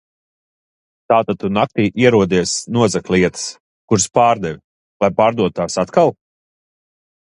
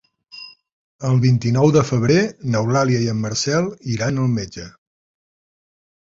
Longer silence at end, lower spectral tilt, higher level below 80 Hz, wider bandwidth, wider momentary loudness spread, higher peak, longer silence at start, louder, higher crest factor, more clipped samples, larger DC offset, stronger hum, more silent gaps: second, 1.15 s vs 1.4 s; about the same, -5 dB/octave vs -6 dB/octave; about the same, -48 dBFS vs -50 dBFS; first, 11.5 kHz vs 7.8 kHz; second, 7 LU vs 21 LU; about the same, 0 dBFS vs -2 dBFS; first, 1.1 s vs 0.35 s; about the same, -16 LUFS vs -18 LUFS; about the same, 18 dB vs 18 dB; neither; neither; neither; first, 3.60-3.88 s, 4.64-5.00 s vs 0.72-0.99 s